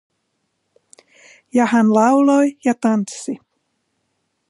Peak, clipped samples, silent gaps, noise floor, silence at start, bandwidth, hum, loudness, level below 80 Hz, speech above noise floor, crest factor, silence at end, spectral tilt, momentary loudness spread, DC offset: -2 dBFS; under 0.1%; none; -71 dBFS; 1.55 s; 11.5 kHz; none; -16 LUFS; -74 dBFS; 56 dB; 16 dB; 1.15 s; -6 dB/octave; 15 LU; under 0.1%